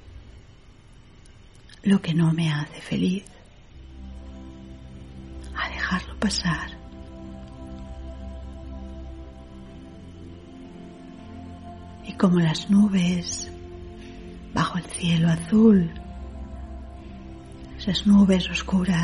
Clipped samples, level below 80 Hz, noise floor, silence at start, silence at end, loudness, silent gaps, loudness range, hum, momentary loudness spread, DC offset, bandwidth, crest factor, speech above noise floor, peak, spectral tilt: under 0.1%; -42 dBFS; -49 dBFS; 0.05 s; 0 s; -22 LUFS; none; 17 LU; none; 24 LU; 0.1%; 11 kHz; 20 dB; 29 dB; -6 dBFS; -6 dB/octave